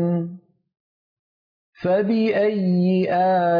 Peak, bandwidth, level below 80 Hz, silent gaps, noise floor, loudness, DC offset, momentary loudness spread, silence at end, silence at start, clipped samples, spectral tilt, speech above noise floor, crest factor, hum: -10 dBFS; 5.2 kHz; -68 dBFS; 0.80-1.73 s; under -90 dBFS; -20 LUFS; under 0.1%; 8 LU; 0 s; 0 s; under 0.1%; -10 dB/octave; over 71 dB; 10 dB; none